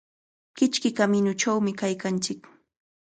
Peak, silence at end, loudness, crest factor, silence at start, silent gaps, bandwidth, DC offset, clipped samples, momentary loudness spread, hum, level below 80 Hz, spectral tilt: -10 dBFS; 0.65 s; -25 LUFS; 18 dB; 0.55 s; none; 9.4 kHz; under 0.1%; under 0.1%; 6 LU; none; -70 dBFS; -4.5 dB/octave